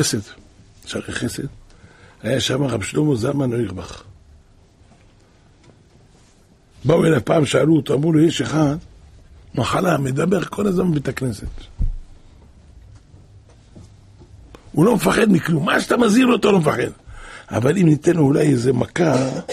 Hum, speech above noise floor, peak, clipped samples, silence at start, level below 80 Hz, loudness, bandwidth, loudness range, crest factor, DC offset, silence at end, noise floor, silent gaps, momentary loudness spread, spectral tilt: none; 34 dB; -4 dBFS; under 0.1%; 0 s; -38 dBFS; -18 LUFS; 15 kHz; 11 LU; 16 dB; under 0.1%; 0 s; -52 dBFS; none; 15 LU; -6 dB/octave